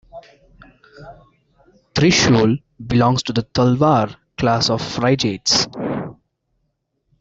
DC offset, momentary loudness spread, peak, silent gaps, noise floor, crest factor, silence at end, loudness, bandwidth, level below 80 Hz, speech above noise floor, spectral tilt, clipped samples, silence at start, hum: under 0.1%; 11 LU; -4 dBFS; none; -71 dBFS; 16 dB; 1.1 s; -17 LUFS; 8 kHz; -46 dBFS; 54 dB; -4.5 dB/octave; under 0.1%; 0.15 s; none